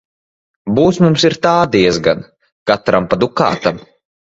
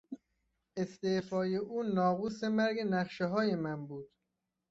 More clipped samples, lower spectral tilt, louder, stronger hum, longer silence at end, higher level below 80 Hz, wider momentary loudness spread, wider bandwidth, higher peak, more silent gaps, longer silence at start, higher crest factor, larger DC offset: neither; about the same, -5.5 dB/octave vs -5.5 dB/octave; first, -14 LUFS vs -34 LUFS; neither; second, 0.5 s vs 0.65 s; first, -46 dBFS vs -72 dBFS; second, 10 LU vs 15 LU; about the same, 8 kHz vs 7.8 kHz; first, 0 dBFS vs -18 dBFS; first, 2.52-2.66 s vs none; first, 0.65 s vs 0.1 s; about the same, 14 dB vs 18 dB; neither